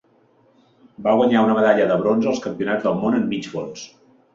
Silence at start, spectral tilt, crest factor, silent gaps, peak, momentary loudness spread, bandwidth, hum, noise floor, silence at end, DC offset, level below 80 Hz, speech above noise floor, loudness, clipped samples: 1 s; -6.5 dB/octave; 18 dB; none; -4 dBFS; 14 LU; 7.6 kHz; none; -58 dBFS; 0.45 s; under 0.1%; -60 dBFS; 39 dB; -19 LUFS; under 0.1%